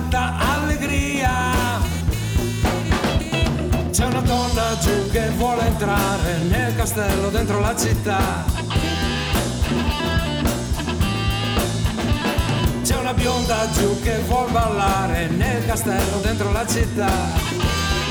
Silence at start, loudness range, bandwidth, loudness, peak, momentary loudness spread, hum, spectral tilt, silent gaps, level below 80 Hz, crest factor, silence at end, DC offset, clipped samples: 0 s; 1 LU; over 20 kHz; -20 LUFS; -8 dBFS; 3 LU; none; -5 dB/octave; none; -26 dBFS; 10 dB; 0 s; under 0.1%; under 0.1%